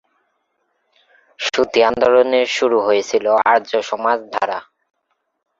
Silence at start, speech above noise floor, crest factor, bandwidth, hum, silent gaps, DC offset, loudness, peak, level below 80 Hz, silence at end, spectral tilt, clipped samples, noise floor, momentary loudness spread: 1.4 s; 53 dB; 16 dB; 7.8 kHz; none; none; under 0.1%; -16 LUFS; -2 dBFS; -60 dBFS; 1 s; -3 dB/octave; under 0.1%; -68 dBFS; 8 LU